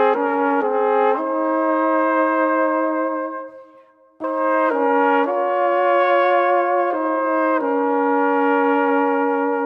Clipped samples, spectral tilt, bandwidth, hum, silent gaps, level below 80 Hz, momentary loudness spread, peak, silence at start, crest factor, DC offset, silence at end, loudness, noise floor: under 0.1%; -5.5 dB/octave; 5.4 kHz; none; none; -84 dBFS; 5 LU; -6 dBFS; 0 s; 12 dB; under 0.1%; 0 s; -18 LUFS; -50 dBFS